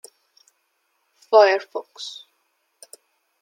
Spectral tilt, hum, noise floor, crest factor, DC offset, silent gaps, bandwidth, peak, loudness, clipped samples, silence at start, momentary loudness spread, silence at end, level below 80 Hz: -1 dB/octave; none; -71 dBFS; 22 dB; under 0.1%; none; 16 kHz; -2 dBFS; -18 LUFS; under 0.1%; 1.3 s; 20 LU; 1.3 s; under -90 dBFS